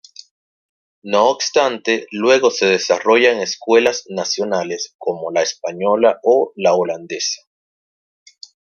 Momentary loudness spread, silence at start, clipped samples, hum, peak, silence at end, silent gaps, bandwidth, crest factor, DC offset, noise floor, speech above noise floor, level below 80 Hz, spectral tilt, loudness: 9 LU; 1.05 s; under 0.1%; none; -2 dBFS; 1.4 s; 4.95-4.99 s; 7.2 kHz; 16 dB; under 0.1%; under -90 dBFS; over 74 dB; -68 dBFS; -2.5 dB/octave; -17 LUFS